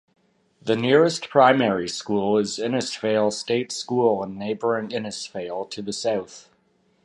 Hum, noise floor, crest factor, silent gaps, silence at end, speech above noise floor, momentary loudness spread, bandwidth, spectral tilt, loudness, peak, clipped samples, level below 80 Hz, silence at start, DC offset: none; -64 dBFS; 20 dB; none; 0.65 s; 42 dB; 13 LU; 11.5 kHz; -4.5 dB/octave; -23 LUFS; -2 dBFS; under 0.1%; -64 dBFS; 0.65 s; under 0.1%